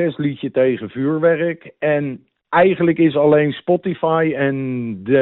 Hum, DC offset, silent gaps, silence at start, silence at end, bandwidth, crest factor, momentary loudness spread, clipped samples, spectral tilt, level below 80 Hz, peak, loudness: none; under 0.1%; none; 0 s; 0 s; 4.1 kHz; 12 dB; 9 LU; under 0.1%; -6 dB/octave; -58 dBFS; -4 dBFS; -18 LUFS